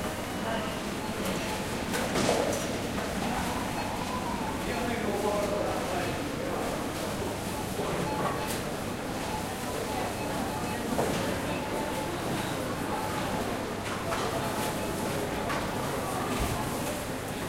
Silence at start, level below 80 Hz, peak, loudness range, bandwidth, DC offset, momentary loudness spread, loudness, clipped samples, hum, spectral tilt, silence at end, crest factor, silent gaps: 0 s; -46 dBFS; -12 dBFS; 2 LU; 16 kHz; under 0.1%; 4 LU; -31 LUFS; under 0.1%; none; -4.5 dB/octave; 0 s; 20 dB; none